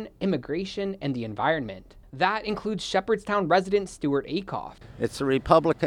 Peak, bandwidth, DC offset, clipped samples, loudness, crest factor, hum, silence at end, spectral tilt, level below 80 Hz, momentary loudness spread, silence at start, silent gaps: -2 dBFS; 13 kHz; under 0.1%; under 0.1%; -26 LUFS; 24 dB; none; 0 s; -6 dB/octave; -50 dBFS; 12 LU; 0 s; none